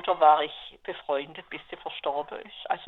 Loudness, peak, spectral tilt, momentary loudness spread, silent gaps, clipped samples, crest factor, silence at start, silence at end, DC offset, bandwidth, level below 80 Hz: -27 LUFS; -8 dBFS; -6 dB/octave; 19 LU; none; under 0.1%; 20 dB; 0 s; 0 s; under 0.1%; 4.2 kHz; -66 dBFS